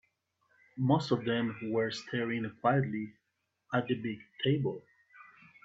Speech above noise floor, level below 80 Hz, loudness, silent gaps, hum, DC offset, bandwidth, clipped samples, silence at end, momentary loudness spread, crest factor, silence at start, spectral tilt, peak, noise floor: 48 dB; -72 dBFS; -33 LUFS; none; none; under 0.1%; 7.8 kHz; under 0.1%; 0.4 s; 11 LU; 20 dB; 0.75 s; -7 dB/octave; -14 dBFS; -80 dBFS